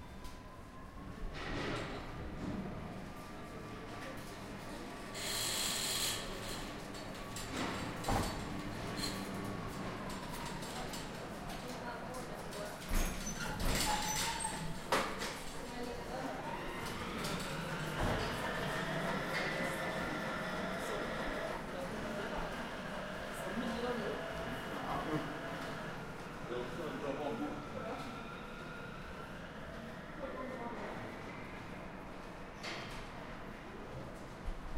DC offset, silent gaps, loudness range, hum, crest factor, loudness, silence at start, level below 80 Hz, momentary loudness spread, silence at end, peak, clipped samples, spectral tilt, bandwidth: under 0.1%; none; 8 LU; none; 22 dB; -41 LUFS; 0 s; -50 dBFS; 12 LU; 0 s; -18 dBFS; under 0.1%; -3.5 dB/octave; 16 kHz